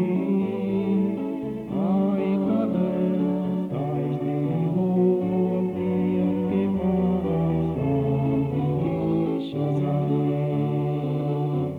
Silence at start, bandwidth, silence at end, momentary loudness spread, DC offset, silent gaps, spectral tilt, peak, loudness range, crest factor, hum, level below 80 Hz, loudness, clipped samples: 0 s; 4.3 kHz; 0 s; 4 LU; under 0.1%; none; -10.5 dB/octave; -12 dBFS; 1 LU; 12 dB; none; -50 dBFS; -24 LUFS; under 0.1%